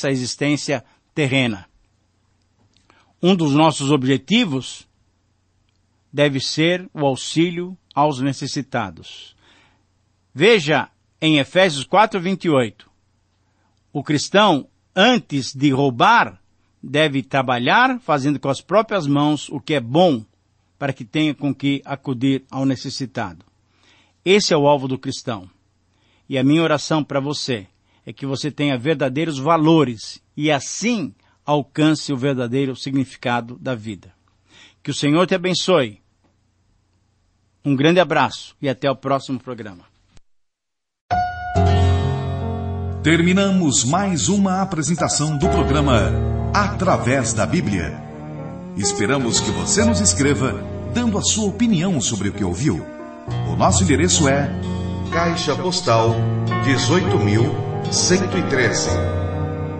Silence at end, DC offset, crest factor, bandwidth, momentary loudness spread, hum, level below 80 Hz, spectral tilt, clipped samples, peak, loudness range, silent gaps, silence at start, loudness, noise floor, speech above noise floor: 0 s; under 0.1%; 18 dB; 8.8 kHz; 12 LU; none; -40 dBFS; -4.5 dB/octave; under 0.1%; -2 dBFS; 5 LU; 41.01-41.09 s; 0 s; -19 LUFS; -80 dBFS; 62 dB